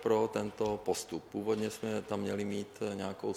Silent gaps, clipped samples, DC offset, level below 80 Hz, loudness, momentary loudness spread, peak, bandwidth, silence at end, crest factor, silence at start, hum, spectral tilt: none; under 0.1%; under 0.1%; -66 dBFS; -36 LUFS; 6 LU; -16 dBFS; 16 kHz; 0 s; 18 dB; 0 s; none; -5 dB/octave